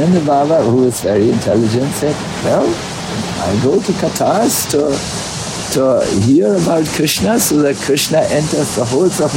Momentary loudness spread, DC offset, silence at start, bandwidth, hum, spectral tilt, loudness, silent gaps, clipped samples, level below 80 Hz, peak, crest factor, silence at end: 7 LU; under 0.1%; 0 s; 16.5 kHz; none; -5 dB/octave; -14 LUFS; none; under 0.1%; -42 dBFS; -2 dBFS; 12 dB; 0 s